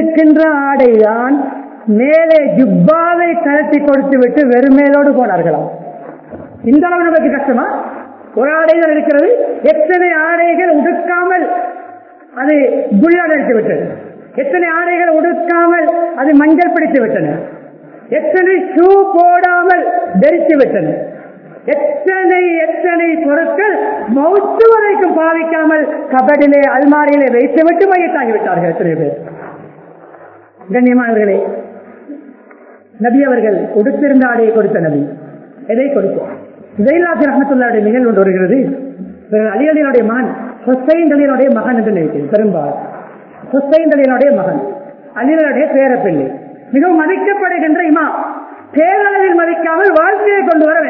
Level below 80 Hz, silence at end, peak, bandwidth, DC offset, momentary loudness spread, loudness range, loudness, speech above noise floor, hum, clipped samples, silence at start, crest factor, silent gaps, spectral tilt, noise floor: -56 dBFS; 0 s; 0 dBFS; 5.4 kHz; under 0.1%; 13 LU; 4 LU; -11 LUFS; 29 dB; none; 0.4%; 0 s; 10 dB; none; -10.5 dB/octave; -39 dBFS